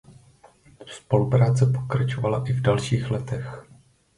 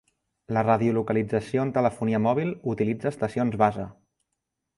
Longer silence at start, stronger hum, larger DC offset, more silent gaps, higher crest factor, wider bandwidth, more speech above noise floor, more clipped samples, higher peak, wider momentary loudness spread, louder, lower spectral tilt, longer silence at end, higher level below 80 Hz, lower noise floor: second, 0.1 s vs 0.5 s; neither; neither; neither; about the same, 20 dB vs 20 dB; about the same, 11 kHz vs 11.5 kHz; second, 32 dB vs 57 dB; neither; about the same, -4 dBFS vs -6 dBFS; first, 18 LU vs 6 LU; about the same, -23 LUFS vs -25 LUFS; second, -7 dB/octave vs -8.5 dB/octave; second, 0.55 s vs 0.85 s; first, -52 dBFS vs -58 dBFS; second, -54 dBFS vs -82 dBFS